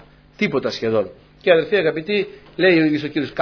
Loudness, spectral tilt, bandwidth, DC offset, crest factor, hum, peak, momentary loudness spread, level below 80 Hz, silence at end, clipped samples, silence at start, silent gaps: -19 LUFS; -6.5 dB/octave; 5.4 kHz; under 0.1%; 18 dB; none; -2 dBFS; 9 LU; -56 dBFS; 0 s; under 0.1%; 0.4 s; none